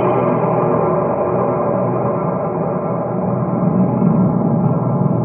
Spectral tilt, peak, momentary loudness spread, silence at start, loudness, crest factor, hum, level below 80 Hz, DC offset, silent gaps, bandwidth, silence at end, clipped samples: -14.5 dB/octave; -2 dBFS; 5 LU; 0 s; -17 LUFS; 14 dB; none; -52 dBFS; under 0.1%; none; 3.2 kHz; 0 s; under 0.1%